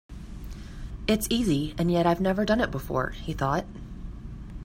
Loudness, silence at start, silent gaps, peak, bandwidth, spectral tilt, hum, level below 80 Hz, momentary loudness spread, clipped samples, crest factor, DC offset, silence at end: -26 LUFS; 0.1 s; none; -10 dBFS; 16 kHz; -5.5 dB/octave; none; -40 dBFS; 18 LU; under 0.1%; 18 dB; under 0.1%; 0 s